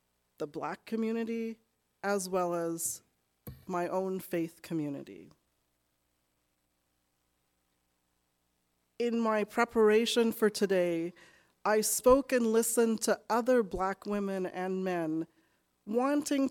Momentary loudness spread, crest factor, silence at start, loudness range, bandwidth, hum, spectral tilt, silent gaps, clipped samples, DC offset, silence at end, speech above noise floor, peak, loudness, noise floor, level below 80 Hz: 13 LU; 20 dB; 0.4 s; 11 LU; 18 kHz; 60 Hz at -65 dBFS; -4 dB/octave; none; under 0.1%; under 0.1%; 0 s; 48 dB; -12 dBFS; -31 LUFS; -78 dBFS; -60 dBFS